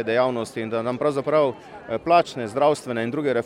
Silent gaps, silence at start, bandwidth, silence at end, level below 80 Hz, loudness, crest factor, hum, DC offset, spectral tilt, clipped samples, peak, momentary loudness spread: none; 0 s; 12.5 kHz; 0 s; -62 dBFS; -23 LUFS; 18 dB; none; under 0.1%; -6 dB/octave; under 0.1%; -4 dBFS; 9 LU